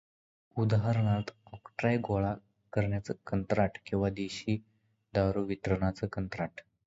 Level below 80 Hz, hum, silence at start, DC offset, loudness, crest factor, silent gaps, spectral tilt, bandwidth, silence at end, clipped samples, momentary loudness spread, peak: -52 dBFS; none; 0.55 s; under 0.1%; -32 LUFS; 18 dB; none; -7.5 dB/octave; 7.8 kHz; 0.25 s; under 0.1%; 9 LU; -14 dBFS